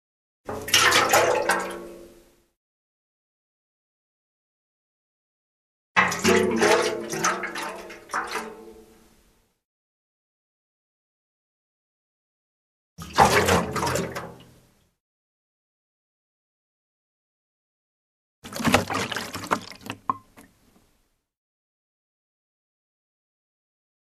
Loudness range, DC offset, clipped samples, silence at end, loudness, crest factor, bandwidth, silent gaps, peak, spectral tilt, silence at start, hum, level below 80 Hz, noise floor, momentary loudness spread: 14 LU; under 0.1%; under 0.1%; 3.95 s; -22 LUFS; 28 dB; 14 kHz; 2.57-5.95 s, 9.65-12.96 s, 15.00-18.42 s; -2 dBFS; -3 dB/octave; 0.45 s; none; -54 dBFS; -69 dBFS; 20 LU